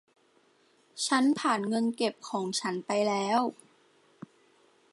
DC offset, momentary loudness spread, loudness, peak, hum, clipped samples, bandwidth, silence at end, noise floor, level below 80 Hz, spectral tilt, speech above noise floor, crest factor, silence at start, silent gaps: under 0.1%; 9 LU; -29 LUFS; -12 dBFS; none; under 0.1%; 11.5 kHz; 1.4 s; -66 dBFS; -84 dBFS; -3.5 dB/octave; 37 dB; 20 dB; 0.95 s; none